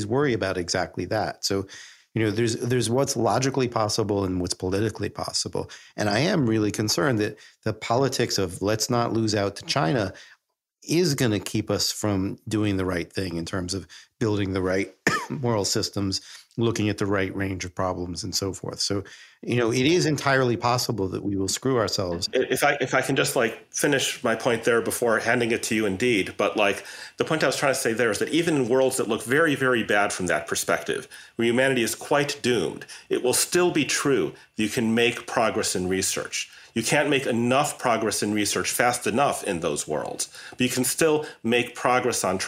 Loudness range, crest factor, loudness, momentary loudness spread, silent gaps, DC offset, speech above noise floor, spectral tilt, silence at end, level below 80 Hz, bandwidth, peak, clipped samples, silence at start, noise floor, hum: 3 LU; 20 dB; -24 LUFS; 8 LU; none; under 0.1%; 38 dB; -4 dB/octave; 0 s; -58 dBFS; 16 kHz; -4 dBFS; under 0.1%; 0 s; -62 dBFS; none